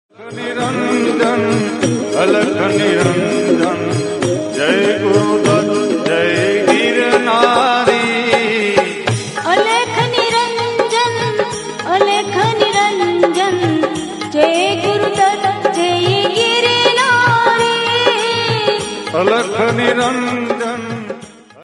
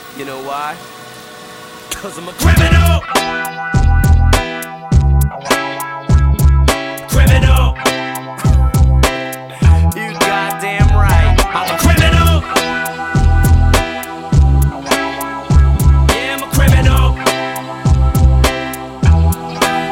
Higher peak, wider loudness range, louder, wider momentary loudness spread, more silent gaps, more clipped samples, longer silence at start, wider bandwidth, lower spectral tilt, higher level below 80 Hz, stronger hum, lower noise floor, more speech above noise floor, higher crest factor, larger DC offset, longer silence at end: about the same, 0 dBFS vs 0 dBFS; about the same, 2 LU vs 2 LU; about the same, -14 LUFS vs -13 LUFS; second, 7 LU vs 13 LU; neither; neither; first, 0.2 s vs 0 s; second, 11.5 kHz vs 17 kHz; second, -4 dB/octave vs -5.5 dB/octave; second, -56 dBFS vs -14 dBFS; neither; first, -36 dBFS vs -32 dBFS; about the same, 22 dB vs 19 dB; about the same, 14 dB vs 12 dB; neither; about the same, 0 s vs 0 s